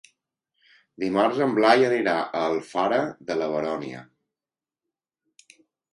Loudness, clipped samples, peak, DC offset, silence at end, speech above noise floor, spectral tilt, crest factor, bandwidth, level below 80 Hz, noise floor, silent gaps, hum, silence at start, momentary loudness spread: -23 LUFS; under 0.1%; -4 dBFS; under 0.1%; 1.9 s; over 67 dB; -5.5 dB/octave; 22 dB; 11.5 kHz; -70 dBFS; under -90 dBFS; none; none; 1 s; 13 LU